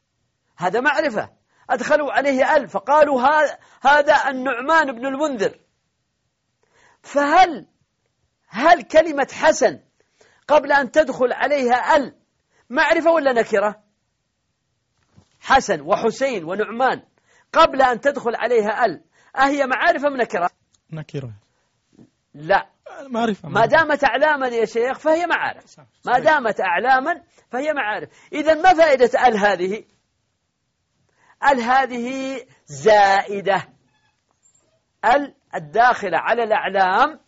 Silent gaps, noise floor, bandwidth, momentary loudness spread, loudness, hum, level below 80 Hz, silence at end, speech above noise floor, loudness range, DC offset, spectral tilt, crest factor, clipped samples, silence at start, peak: none; -72 dBFS; 8 kHz; 14 LU; -18 LUFS; none; -54 dBFS; 0.1 s; 54 dB; 5 LU; under 0.1%; -2 dB/octave; 18 dB; under 0.1%; 0.6 s; -2 dBFS